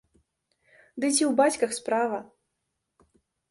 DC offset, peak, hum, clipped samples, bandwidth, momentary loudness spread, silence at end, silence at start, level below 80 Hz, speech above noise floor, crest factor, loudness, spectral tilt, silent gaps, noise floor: under 0.1%; -10 dBFS; none; under 0.1%; 11.5 kHz; 11 LU; 1.25 s; 0.95 s; -72 dBFS; 56 dB; 20 dB; -25 LUFS; -2.5 dB/octave; none; -81 dBFS